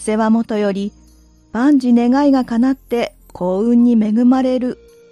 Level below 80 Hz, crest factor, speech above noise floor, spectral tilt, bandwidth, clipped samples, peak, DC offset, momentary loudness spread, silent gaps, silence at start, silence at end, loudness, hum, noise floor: -48 dBFS; 12 dB; 34 dB; -6.5 dB/octave; 11 kHz; under 0.1%; -4 dBFS; under 0.1%; 12 LU; none; 0 s; 0.35 s; -15 LUFS; none; -48 dBFS